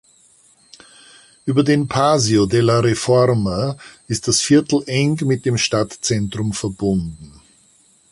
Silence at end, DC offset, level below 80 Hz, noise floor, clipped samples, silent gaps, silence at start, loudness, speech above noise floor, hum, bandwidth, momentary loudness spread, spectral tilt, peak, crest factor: 0.85 s; under 0.1%; -46 dBFS; -54 dBFS; under 0.1%; none; 1.45 s; -17 LUFS; 37 dB; none; 11.5 kHz; 8 LU; -5 dB/octave; -2 dBFS; 16 dB